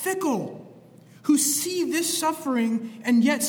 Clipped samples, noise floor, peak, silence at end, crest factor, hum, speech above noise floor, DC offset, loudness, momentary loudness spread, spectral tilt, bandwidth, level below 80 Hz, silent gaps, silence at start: under 0.1%; -50 dBFS; -10 dBFS; 0 s; 14 dB; none; 26 dB; under 0.1%; -24 LUFS; 10 LU; -3 dB/octave; over 20 kHz; -76 dBFS; none; 0 s